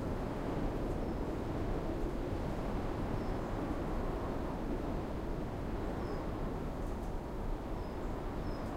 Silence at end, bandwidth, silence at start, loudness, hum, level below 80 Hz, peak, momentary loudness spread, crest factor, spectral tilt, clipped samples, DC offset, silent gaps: 0 s; 15.5 kHz; 0 s; -39 LUFS; none; -42 dBFS; -24 dBFS; 3 LU; 14 dB; -7.5 dB/octave; under 0.1%; 0.1%; none